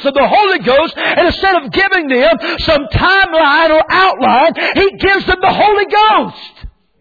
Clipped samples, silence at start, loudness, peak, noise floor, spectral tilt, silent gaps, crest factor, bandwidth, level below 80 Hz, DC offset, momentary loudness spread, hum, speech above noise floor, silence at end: under 0.1%; 0 s; -10 LUFS; -2 dBFS; -33 dBFS; -6 dB/octave; none; 10 dB; 5 kHz; -32 dBFS; under 0.1%; 4 LU; none; 23 dB; 0.3 s